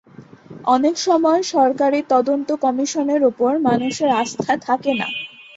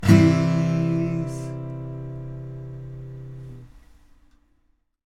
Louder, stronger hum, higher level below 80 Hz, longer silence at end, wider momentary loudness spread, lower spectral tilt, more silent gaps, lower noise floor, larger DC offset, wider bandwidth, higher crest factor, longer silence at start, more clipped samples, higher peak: first, -18 LUFS vs -23 LUFS; neither; second, -64 dBFS vs -48 dBFS; second, 0.15 s vs 1.25 s; second, 5 LU vs 21 LU; second, -4 dB/octave vs -7.5 dB/octave; neither; second, -42 dBFS vs -66 dBFS; neither; second, 8 kHz vs 13 kHz; second, 16 dB vs 22 dB; first, 0.2 s vs 0 s; neither; about the same, -2 dBFS vs -2 dBFS